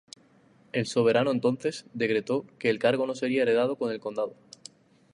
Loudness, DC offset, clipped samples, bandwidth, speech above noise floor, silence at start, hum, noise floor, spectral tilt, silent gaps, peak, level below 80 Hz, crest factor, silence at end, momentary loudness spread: -27 LUFS; under 0.1%; under 0.1%; 11 kHz; 33 dB; 0.75 s; none; -60 dBFS; -5.5 dB/octave; none; -8 dBFS; -74 dBFS; 18 dB; 0.85 s; 10 LU